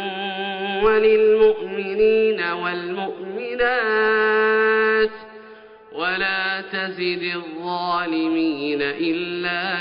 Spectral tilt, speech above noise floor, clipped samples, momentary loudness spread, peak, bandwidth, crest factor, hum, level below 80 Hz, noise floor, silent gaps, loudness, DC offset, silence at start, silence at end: -1.5 dB/octave; 23 dB; under 0.1%; 11 LU; -6 dBFS; 5.4 kHz; 14 dB; none; -54 dBFS; -44 dBFS; none; -20 LUFS; under 0.1%; 0 s; 0 s